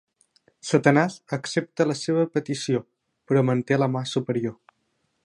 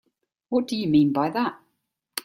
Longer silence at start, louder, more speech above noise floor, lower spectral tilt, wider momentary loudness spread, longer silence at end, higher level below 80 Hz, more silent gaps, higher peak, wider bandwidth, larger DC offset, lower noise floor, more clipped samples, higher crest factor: first, 0.65 s vs 0.5 s; about the same, -24 LUFS vs -23 LUFS; second, 50 dB vs 54 dB; about the same, -6 dB/octave vs -6 dB/octave; about the same, 8 LU vs 9 LU; first, 0.7 s vs 0.05 s; second, -70 dBFS vs -62 dBFS; neither; first, -2 dBFS vs -8 dBFS; second, 11.5 kHz vs 16.5 kHz; neither; about the same, -73 dBFS vs -76 dBFS; neither; first, 22 dB vs 16 dB